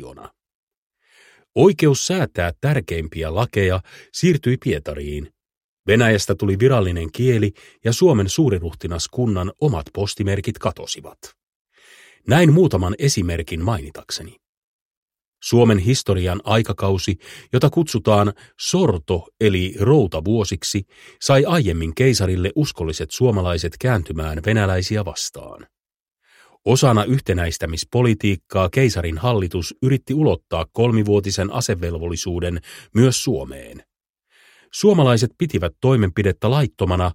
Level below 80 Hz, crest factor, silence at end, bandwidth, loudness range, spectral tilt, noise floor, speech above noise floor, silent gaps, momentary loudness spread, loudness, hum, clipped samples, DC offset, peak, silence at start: -38 dBFS; 18 dB; 0 s; 16.5 kHz; 3 LU; -5.5 dB/octave; -75 dBFS; 57 dB; 0.54-0.67 s, 0.77-0.90 s, 5.57-5.84 s, 11.43-11.65 s, 14.49-15.08 s, 15.27-15.32 s, 25.96-26.06 s; 11 LU; -19 LUFS; none; under 0.1%; under 0.1%; -2 dBFS; 0 s